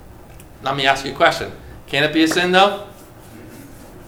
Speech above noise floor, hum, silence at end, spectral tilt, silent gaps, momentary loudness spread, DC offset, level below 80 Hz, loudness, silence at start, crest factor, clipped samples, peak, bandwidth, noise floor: 23 dB; none; 0 s; -4 dB/octave; none; 24 LU; under 0.1%; -46 dBFS; -17 LUFS; 0.05 s; 20 dB; under 0.1%; 0 dBFS; 19.5 kHz; -40 dBFS